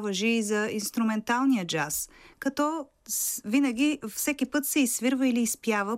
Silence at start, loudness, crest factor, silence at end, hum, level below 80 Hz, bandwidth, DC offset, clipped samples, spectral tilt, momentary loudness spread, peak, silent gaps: 0 s; -27 LUFS; 16 dB; 0 s; none; -64 dBFS; 16 kHz; under 0.1%; under 0.1%; -3 dB/octave; 6 LU; -12 dBFS; none